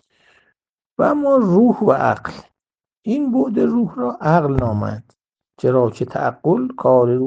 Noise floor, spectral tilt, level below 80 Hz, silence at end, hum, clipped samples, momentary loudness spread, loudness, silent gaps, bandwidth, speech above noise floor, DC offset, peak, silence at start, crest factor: -90 dBFS; -9.5 dB/octave; -46 dBFS; 0 s; none; under 0.1%; 10 LU; -17 LUFS; none; 7.8 kHz; 73 dB; under 0.1%; 0 dBFS; 1 s; 18 dB